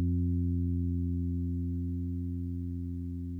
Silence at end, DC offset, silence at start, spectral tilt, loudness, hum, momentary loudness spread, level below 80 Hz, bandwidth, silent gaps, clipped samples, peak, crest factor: 0 s; under 0.1%; 0 s; -12.5 dB/octave; -34 LUFS; none; 7 LU; -50 dBFS; 0.5 kHz; none; under 0.1%; -22 dBFS; 10 dB